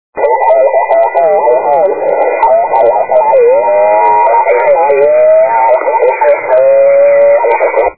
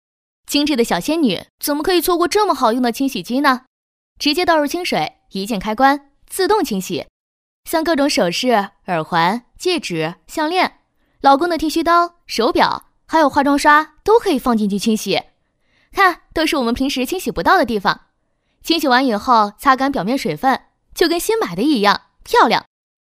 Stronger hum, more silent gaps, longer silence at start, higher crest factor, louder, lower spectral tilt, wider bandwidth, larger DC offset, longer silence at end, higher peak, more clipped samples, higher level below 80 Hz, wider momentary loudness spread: neither; second, none vs 1.50-1.58 s, 3.67-4.16 s, 7.09-7.63 s; second, 0.15 s vs 0.5 s; second, 8 dB vs 18 dB; first, -8 LUFS vs -17 LUFS; first, -8 dB/octave vs -4 dB/octave; second, 4 kHz vs 16 kHz; first, 1% vs under 0.1%; second, 0.05 s vs 0.55 s; about the same, 0 dBFS vs 0 dBFS; first, 0.4% vs under 0.1%; second, -54 dBFS vs -46 dBFS; second, 4 LU vs 8 LU